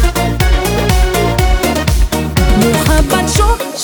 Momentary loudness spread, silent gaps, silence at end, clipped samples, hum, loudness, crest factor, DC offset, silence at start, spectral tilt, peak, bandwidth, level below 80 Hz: 3 LU; none; 0 s; under 0.1%; none; -12 LUFS; 10 dB; under 0.1%; 0 s; -5 dB/octave; 0 dBFS; over 20 kHz; -14 dBFS